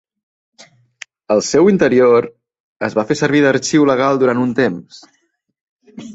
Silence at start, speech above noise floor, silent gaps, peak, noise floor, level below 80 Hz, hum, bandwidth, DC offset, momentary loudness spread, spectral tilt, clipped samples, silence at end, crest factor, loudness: 1.3 s; 27 dB; 2.60-2.80 s, 5.61-5.76 s; -2 dBFS; -40 dBFS; -56 dBFS; none; 8.2 kHz; under 0.1%; 10 LU; -5.5 dB/octave; under 0.1%; 0 s; 14 dB; -14 LUFS